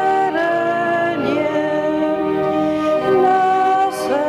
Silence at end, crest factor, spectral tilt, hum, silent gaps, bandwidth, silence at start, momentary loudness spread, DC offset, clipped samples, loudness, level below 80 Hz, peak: 0 s; 10 dB; -5.5 dB/octave; none; none; 14.5 kHz; 0 s; 4 LU; under 0.1%; under 0.1%; -17 LUFS; -56 dBFS; -6 dBFS